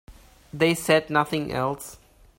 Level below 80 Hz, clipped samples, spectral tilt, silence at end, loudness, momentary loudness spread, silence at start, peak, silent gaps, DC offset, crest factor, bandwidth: -54 dBFS; under 0.1%; -4.5 dB/octave; 0.45 s; -23 LUFS; 17 LU; 0.1 s; -6 dBFS; none; under 0.1%; 20 dB; 16.5 kHz